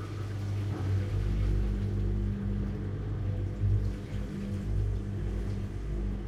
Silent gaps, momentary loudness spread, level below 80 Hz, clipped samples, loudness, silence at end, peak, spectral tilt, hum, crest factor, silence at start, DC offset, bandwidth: none; 5 LU; -36 dBFS; under 0.1%; -33 LUFS; 0 s; -18 dBFS; -8.5 dB/octave; 50 Hz at -40 dBFS; 12 dB; 0 s; under 0.1%; 8.4 kHz